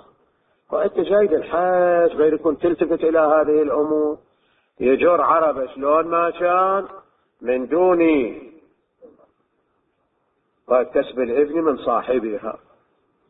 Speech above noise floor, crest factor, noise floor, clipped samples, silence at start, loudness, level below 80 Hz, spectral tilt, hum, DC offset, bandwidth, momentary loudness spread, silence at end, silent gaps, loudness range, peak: 50 dB; 16 dB; -68 dBFS; under 0.1%; 0.7 s; -19 LUFS; -56 dBFS; -11 dB/octave; none; under 0.1%; 4 kHz; 10 LU; 0.75 s; none; 6 LU; -4 dBFS